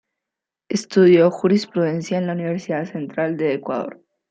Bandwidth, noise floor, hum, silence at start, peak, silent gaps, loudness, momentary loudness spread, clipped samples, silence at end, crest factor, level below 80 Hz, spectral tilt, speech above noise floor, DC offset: 8.6 kHz; -85 dBFS; none; 0.7 s; -4 dBFS; none; -20 LUFS; 13 LU; under 0.1%; 0.35 s; 16 dB; -68 dBFS; -6.5 dB/octave; 67 dB; under 0.1%